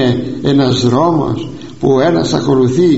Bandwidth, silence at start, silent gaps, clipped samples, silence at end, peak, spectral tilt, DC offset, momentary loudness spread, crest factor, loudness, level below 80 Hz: 8 kHz; 0 s; none; under 0.1%; 0 s; 0 dBFS; -6.5 dB/octave; 1%; 7 LU; 12 dB; -13 LUFS; -42 dBFS